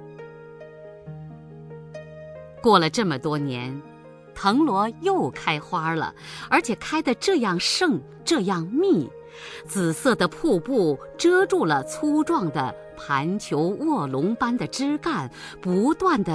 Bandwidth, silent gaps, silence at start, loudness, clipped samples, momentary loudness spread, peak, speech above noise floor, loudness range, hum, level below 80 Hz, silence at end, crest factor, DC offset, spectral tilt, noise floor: 11 kHz; none; 0 s; -23 LUFS; under 0.1%; 20 LU; -4 dBFS; 20 dB; 3 LU; none; -56 dBFS; 0 s; 20 dB; under 0.1%; -5 dB/octave; -42 dBFS